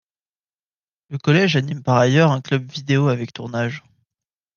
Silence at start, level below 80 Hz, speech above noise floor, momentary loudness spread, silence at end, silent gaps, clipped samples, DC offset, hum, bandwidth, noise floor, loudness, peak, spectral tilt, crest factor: 1.1 s; -62 dBFS; over 72 dB; 11 LU; 0.75 s; none; under 0.1%; under 0.1%; none; 7.2 kHz; under -90 dBFS; -19 LUFS; -2 dBFS; -6.5 dB/octave; 18 dB